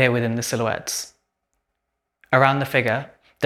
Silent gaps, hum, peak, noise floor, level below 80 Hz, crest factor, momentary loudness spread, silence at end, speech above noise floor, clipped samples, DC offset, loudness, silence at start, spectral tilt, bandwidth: none; none; 0 dBFS; -79 dBFS; -60 dBFS; 22 dB; 11 LU; 0 s; 58 dB; under 0.1%; under 0.1%; -21 LUFS; 0 s; -4.5 dB/octave; 16 kHz